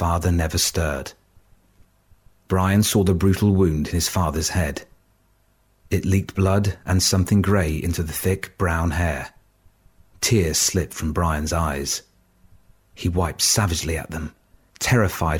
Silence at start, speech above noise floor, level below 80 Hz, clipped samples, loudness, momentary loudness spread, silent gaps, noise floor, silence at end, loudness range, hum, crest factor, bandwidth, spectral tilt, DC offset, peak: 0 s; 41 dB; -36 dBFS; under 0.1%; -21 LUFS; 9 LU; none; -61 dBFS; 0 s; 3 LU; none; 16 dB; 17.5 kHz; -4.5 dB/octave; under 0.1%; -6 dBFS